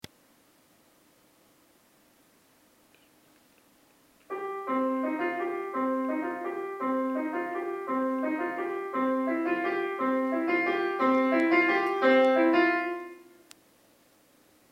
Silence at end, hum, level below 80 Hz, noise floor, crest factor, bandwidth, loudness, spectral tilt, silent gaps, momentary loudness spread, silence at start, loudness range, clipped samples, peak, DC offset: 1.5 s; none; -80 dBFS; -63 dBFS; 18 dB; 15.5 kHz; -28 LUFS; -5 dB/octave; none; 11 LU; 4.3 s; 10 LU; under 0.1%; -12 dBFS; under 0.1%